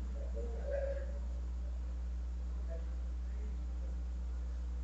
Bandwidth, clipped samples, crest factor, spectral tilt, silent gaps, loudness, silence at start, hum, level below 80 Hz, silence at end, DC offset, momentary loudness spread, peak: 7.6 kHz; under 0.1%; 12 dB; -8 dB/octave; none; -42 LUFS; 0 s; 60 Hz at -40 dBFS; -40 dBFS; 0 s; under 0.1%; 3 LU; -28 dBFS